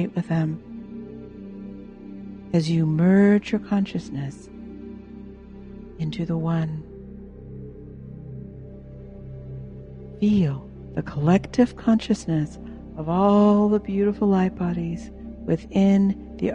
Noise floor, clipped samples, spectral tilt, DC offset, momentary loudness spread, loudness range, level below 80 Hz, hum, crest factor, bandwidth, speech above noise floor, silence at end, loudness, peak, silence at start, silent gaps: -41 dBFS; under 0.1%; -8 dB/octave; under 0.1%; 22 LU; 10 LU; -46 dBFS; none; 18 dB; 9 kHz; 20 dB; 0 s; -22 LUFS; -6 dBFS; 0 s; none